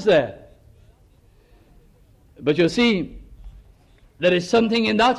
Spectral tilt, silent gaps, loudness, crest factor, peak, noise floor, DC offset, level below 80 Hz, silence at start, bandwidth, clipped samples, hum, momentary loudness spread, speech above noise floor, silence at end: -5.5 dB/octave; none; -20 LUFS; 16 dB; -8 dBFS; -54 dBFS; under 0.1%; -48 dBFS; 0 s; 11.5 kHz; under 0.1%; none; 9 LU; 35 dB; 0 s